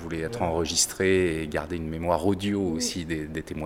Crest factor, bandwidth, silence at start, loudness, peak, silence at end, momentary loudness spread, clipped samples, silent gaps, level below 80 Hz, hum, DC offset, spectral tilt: 18 dB; 17 kHz; 0 s; -26 LUFS; -8 dBFS; 0 s; 9 LU; under 0.1%; none; -48 dBFS; none; under 0.1%; -4 dB/octave